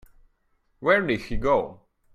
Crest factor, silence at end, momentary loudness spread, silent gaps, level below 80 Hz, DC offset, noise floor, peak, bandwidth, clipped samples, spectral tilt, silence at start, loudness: 20 dB; 0.4 s; 7 LU; none; -42 dBFS; under 0.1%; -68 dBFS; -6 dBFS; 13 kHz; under 0.1%; -6.5 dB/octave; 0.8 s; -24 LUFS